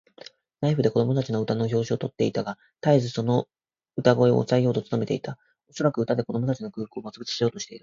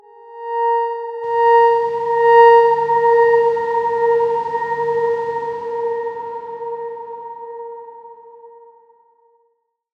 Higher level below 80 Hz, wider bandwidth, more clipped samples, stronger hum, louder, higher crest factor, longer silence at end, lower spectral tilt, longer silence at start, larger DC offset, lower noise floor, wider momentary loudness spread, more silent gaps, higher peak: about the same, -62 dBFS vs -64 dBFS; first, 7.6 kHz vs 6 kHz; neither; neither; second, -25 LUFS vs -16 LUFS; first, 22 dB vs 16 dB; second, 0.05 s vs 1.5 s; first, -7 dB/octave vs -5 dB/octave; first, 0.6 s vs 0.25 s; neither; second, -49 dBFS vs -66 dBFS; second, 14 LU vs 20 LU; neither; about the same, -2 dBFS vs -2 dBFS